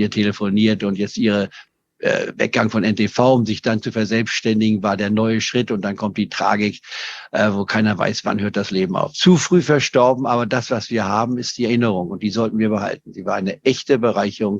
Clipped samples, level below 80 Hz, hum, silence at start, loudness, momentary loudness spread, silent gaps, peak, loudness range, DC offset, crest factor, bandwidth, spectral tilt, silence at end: under 0.1%; -60 dBFS; none; 0 s; -19 LUFS; 7 LU; none; -2 dBFS; 3 LU; under 0.1%; 18 dB; 7.8 kHz; -5.5 dB/octave; 0 s